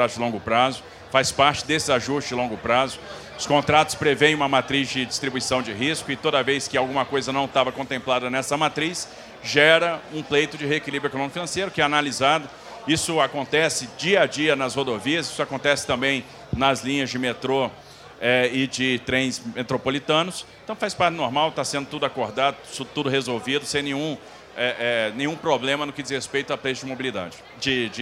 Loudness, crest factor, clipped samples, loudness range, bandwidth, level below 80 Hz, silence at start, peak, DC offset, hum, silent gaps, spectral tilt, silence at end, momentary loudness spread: -23 LUFS; 22 dB; under 0.1%; 4 LU; 16 kHz; -54 dBFS; 0 s; 0 dBFS; under 0.1%; none; none; -3.5 dB/octave; 0 s; 9 LU